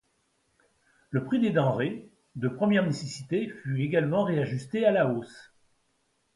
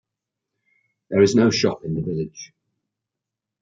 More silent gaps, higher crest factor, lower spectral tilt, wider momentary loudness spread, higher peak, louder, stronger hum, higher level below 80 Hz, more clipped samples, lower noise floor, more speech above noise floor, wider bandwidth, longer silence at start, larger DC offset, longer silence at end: neither; about the same, 18 dB vs 20 dB; first, -7 dB/octave vs -5.5 dB/octave; second, 10 LU vs 15 LU; second, -10 dBFS vs -4 dBFS; second, -28 LUFS vs -20 LUFS; neither; second, -68 dBFS vs -58 dBFS; neither; second, -73 dBFS vs -85 dBFS; second, 46 dB vs 66 dB; first, 11.5 kHz vs 7.8 kHz; about the same, 1.1 s vs 1.1 s; neither; second, 0.95 s vs 1.15 s